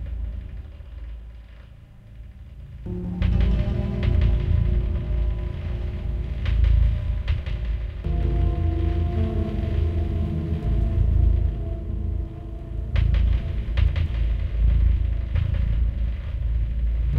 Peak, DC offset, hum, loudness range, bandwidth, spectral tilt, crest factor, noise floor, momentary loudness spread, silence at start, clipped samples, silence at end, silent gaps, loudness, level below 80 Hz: -8 dBFS; under 0.1%; none; 2 LU; 4.7 kHz; -9.5 dB/octave; 14 dB; -45 dBFS; 16 LU; 0 s; under 0.1%; 0 s; none; -25 LUFS; -24 dBFS